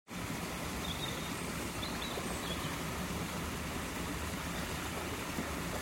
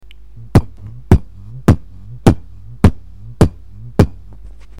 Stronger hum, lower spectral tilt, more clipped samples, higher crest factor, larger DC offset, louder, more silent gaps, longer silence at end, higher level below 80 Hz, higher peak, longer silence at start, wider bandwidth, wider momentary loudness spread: neither; second, -4 dB/octave vs -8 dB/octave; neither; about the same, 14 dB vs 16 dB; second, under 0.1% vs 1%; second, -38 LUFS vs -16 LUFS; neither; second, 0 s vs 0.7 s; second, -50 dBFS vs -24 dBFS; second, -24 dBFS vs 0 dBFS; second, 0.1 s vs 0.55 s; about the same, 16.5 kHz vs 15 kHz; second, 1 LU vs 21 LU